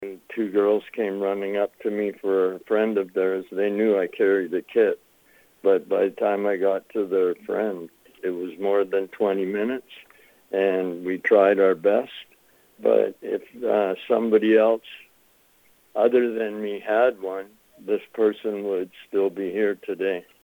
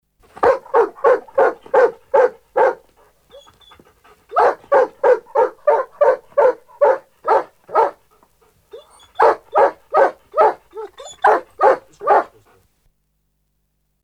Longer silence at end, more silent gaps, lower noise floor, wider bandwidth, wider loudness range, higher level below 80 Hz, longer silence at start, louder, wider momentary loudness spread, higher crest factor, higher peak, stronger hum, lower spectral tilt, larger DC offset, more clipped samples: second, 0.25 s vs 1.8 s; neither; second, -60 dBFS vs -68 dBFS; first, over 20 kHz vs 9.4 kHz; about the same, 3 LU vs 3 LU; second, -74 dBFS vs -60 dBFS; second, 0 s vs 0.4 s; second, -23 LUFS vs -17 LUFS; first, 10 LU vs 6 LU; about the same, 18 dB vs 18 dB; second, -4 dBFS vs 0 dBFS; neither; first, -7 dB/octave vs -4.5 dB/octave; neither; neither